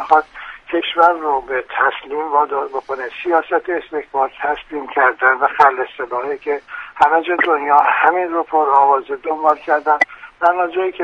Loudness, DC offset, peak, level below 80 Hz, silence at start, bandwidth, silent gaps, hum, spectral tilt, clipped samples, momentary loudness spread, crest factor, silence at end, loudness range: -16 LUFS; under 0.1%; 0 dBFS; -56 dBFS; 0 s; 7.8 kHz; none; none; -4 dB/octave; under 0.1%; 10 LU; 16 dB; 0 s; 4 LU